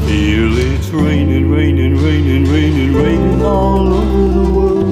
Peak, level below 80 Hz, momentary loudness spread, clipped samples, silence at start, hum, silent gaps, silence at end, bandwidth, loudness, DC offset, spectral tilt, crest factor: -2 dBFS; -18 dBFS; 1 LU; under 0.1%; 0 s; none; none; 0 s; 12.5 kHz; -12 LUFS; under 0.1%; -7.5 dB/octave; 10 dB